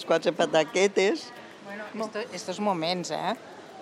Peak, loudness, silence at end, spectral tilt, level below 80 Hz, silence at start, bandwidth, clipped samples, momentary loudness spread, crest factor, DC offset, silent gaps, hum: -10 dBFS; -27 LUFS; 0 s; -4 dB/octave; -78 dBFS; 0 s; 13.5 kHz; under 0.1%; 17 LU; 18 dB; under 0.1%; none; none